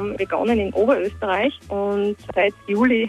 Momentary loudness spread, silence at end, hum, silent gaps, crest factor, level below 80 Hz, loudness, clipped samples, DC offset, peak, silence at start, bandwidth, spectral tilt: 5 LU; 0 s; none; none; 16 dB; -46 dBFS; -21 LUFS; under 0.1%; under 0.1%; -6 dBFS; 0 s; 11.5 kHz; -6.5 dB/octave